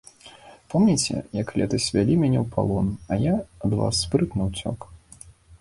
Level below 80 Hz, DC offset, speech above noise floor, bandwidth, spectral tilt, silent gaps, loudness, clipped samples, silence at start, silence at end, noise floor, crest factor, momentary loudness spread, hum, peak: -44 dBFS; under 0.1%; 26 dB; 11.5 kHz; -5.5 dB/octave; none; -24 LUFS; under 0.1%; 0.25 s; 0.05 s; -49 dBFS; 18 dB; 8 LU; none; -6 dBFS